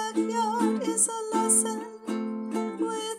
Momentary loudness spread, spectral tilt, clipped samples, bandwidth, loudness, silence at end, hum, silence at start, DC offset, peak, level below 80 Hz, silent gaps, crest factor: 10 LU; -3 dB/octave; under 0.1%; 17 kHz; -26 LUFS; 0 s; none; 0 s; under 0.1%; -10 dBFS; -82 dBFS; none; 18 dB